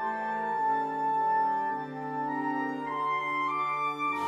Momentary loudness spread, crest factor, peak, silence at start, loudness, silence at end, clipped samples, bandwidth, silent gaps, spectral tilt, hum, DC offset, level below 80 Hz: 6 LU; 12 dB; -18 dBFS; 0 s; -30 LUFS; 0 s; under 0.1%; 10 kHz; none; -5.5 dB/octave; none; under 0.1%; -78 dBFS